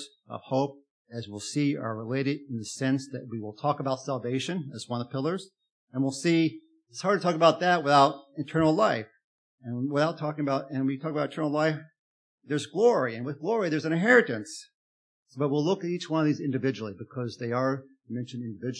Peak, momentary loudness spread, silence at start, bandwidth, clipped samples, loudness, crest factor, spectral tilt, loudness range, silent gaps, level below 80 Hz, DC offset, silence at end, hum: -6 dBFS; 16 LU; 0 s; 10.5 kHz; under 0.1%; -28 LUFS; 22 dB; -6 dB/octave; 6 LU; 0.91-1.05 s, 5.70-5.87 s, 9.24-9.58 s, 11.99-12.38 s, 14.74-15.26 s; -72 dBFS; under 0.1%; 0 s; none